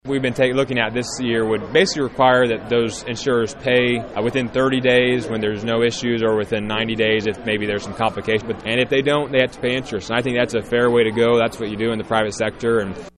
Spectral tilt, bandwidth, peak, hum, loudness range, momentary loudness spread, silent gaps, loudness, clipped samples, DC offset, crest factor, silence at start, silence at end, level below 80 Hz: -5 dB/octave; 11.5 kHz; -2 dBFS; none; 2 LU; 6 LU; none; -19 LUFS; under 0.1%; under 0.1%; 16 dB; 0.05 s; 0.1 s; -48 dBFS